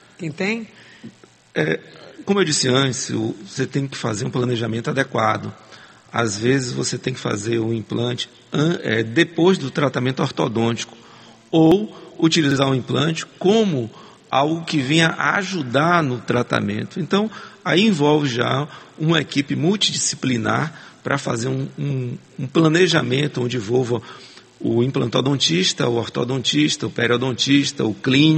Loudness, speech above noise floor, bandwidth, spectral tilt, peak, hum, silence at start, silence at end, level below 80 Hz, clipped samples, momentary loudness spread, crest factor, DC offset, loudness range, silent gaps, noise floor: -20 LUFS; 26 dB; 8.8 kHz; -4.5 dB/octave; 0 dBFS; none; 0.2 s; 0 s; -60 dBFS; under 0.1%; 10 LU; 20 dB; under 0.1%; 3 LU; none; -45 dBFS